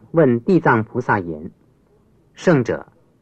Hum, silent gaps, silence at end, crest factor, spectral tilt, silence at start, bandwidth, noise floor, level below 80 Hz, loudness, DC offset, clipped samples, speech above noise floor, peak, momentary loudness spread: none; none; 0.4 s; 16 dB; -8 dB/octave; 0.15 s; 8.4 kHz; -56 dBFS; -54 dBFS; -18 LUFS; under 0.1%; under 0.1%; 38 dB; -2 dBFS; 15 LU